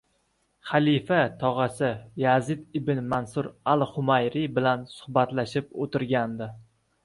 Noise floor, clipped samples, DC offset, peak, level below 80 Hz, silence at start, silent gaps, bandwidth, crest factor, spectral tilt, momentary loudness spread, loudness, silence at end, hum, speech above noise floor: -71 dBFS; under 0.1%; under 0.1%; -6 dBFS; -60 dBFS; 0.65 s; none; 11.5 kHz; 20 dB; -7 dB/octave; 8 LU; -26 LUFS; 0.4 s; none; 45 dB